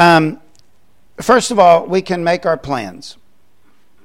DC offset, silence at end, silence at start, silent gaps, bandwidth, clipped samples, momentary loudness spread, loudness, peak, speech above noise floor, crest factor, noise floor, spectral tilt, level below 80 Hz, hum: 0.7%; 0.9 s; 0 s; none; 16 kHz; under 0.1%; 22 LU; -14 LUFS; 0 dBFS; 45 dB; 16 dB; -58 dBFS; -5 dB/octave; -50 dBFS; none